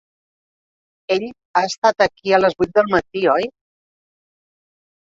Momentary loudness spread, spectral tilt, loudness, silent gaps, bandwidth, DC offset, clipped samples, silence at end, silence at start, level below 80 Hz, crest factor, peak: 6 LU; -4.5 dB/octave; -18 LUFS; 1.45-1.54 s, 1.78-1.82 s; 7.8 kHz; under 0.1%; under 0.1%; 1.55 s; 1.1 s; -56 dBFS; 20 dB; -2 dBFS